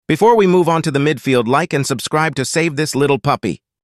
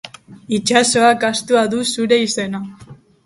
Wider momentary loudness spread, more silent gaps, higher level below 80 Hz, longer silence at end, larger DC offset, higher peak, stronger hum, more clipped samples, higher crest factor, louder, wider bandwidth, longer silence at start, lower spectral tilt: second, 7 LU vs 14 LU; neither; first, -52 dBFS vs -58 dBFS; about the same, 0.25 s vs 0.3 s; neither; about the same, -2 dBFS vs 0 dBFS; neither; neither; about the same, 14 dB vs 18 dB; about the same, -15 LUFS vs -16 LUFS; first, 14.5 kHz vs 11.5 kHz; about the same, 0.1 s vs 0.05 s; first, -5 dB/octave vs -3 dB/octave